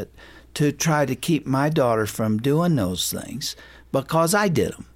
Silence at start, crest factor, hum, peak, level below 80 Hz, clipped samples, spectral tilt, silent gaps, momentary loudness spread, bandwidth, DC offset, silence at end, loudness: 0 s; 14 dB; none; -8 dBFS; -52 dBFS; under 0.1%; -5 dB/octave; none; 10 LU; 16.5 kHz; under 0.1%; 0.1 s; -22 LUFS